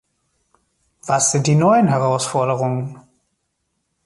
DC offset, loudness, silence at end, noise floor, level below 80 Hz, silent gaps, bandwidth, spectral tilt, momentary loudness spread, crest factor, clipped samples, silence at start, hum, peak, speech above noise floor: under 0.1%; -17 LUFS; 1.05 s; -72 dBFS; -60 dBFS; none; 11.5 kHz; -5 dB/octave; 12 LU; 16 dB; under 0.1%; 1.05 s; none; -4 dBFS; 55 dB